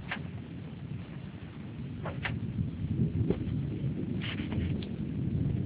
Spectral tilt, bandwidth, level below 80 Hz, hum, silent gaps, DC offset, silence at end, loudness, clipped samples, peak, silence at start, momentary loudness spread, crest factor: -7 dB/octave; 4 kHz; -46 dBFS; none; none; under 0.1%; 0 s; -35 LUFS; under 0.1%; -14 dBFS; 0 s; 11 LU; 20 dB